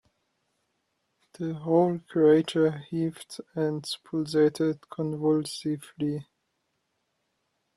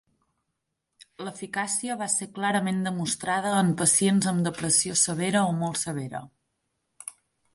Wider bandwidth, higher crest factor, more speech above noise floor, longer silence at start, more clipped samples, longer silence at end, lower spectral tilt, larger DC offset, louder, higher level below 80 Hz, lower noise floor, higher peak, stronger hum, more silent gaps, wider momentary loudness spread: about the same, 12.5 kHz vs 11.5 kHz; about the same, 18 dB vs 20 dB; second, 51 dB vs 55 dB; first, 1.4 s vs 1.2 s; neither; first, 1.55 s vs 0.45 s; first, -6.5 dB/octave vs -3.5 dB/octave; neither; about the same, -27 LUFS vs -25 LUFS; about the same, -70 dBFS vs -66 dBFS; second, -77 dBFS vs -81 dBFS; about the same, -10 dBFS vs -8 dBFS; neither; neither; second, 12 LU vs 18 LU